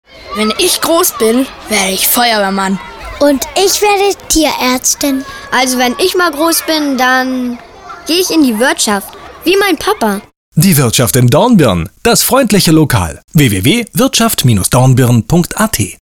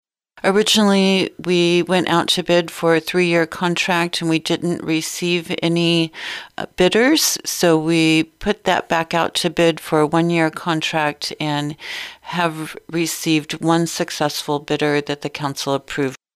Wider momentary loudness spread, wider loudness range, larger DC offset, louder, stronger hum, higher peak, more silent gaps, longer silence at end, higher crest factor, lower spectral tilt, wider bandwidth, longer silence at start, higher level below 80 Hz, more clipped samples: about the same, 8 LU vs 9 LU; about the same, 3 LU vs 5 LU; neither; first, -10 LUFS vs -18 LUFS; neither; first, 0 dBFS vs -4 dBFS; first, 10.36-10.52 s, 13.24-13.28 s vs none; about the same, 0.1 s vs 0.2 s; about the same, 10 dB vs 14 dB; about the same, -4 dB/octave vs -4 dB/octave; first, over 20 kHz vs 15.5 kHz; second, 0.15 s vs 0.35 s; first, -36 dBFS vs -52 dBFS; neither